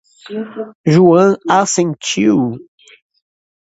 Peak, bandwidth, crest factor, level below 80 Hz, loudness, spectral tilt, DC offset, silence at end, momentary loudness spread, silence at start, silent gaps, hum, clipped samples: 0 dBFS; 8 kHz; 14 dB; -58 dBFS; -13 LUFS; -5.5 dB/octave; under 0.1%; 1 s; 17 LU; 0.3 s; 0.75-0.84 s; none; under 0.1%